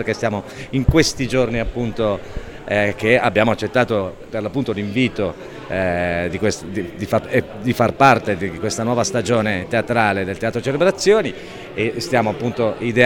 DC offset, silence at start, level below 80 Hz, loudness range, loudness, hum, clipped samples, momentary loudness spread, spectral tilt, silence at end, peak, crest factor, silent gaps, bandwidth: under 0.1%; 0 s; -36 dBFS; 3 LU; -19 LUFS; none; under 0.1%; 11 LU; -5 dB/octave; 0 s; 0 dBFS; 18 dB; none; 17.5 kHz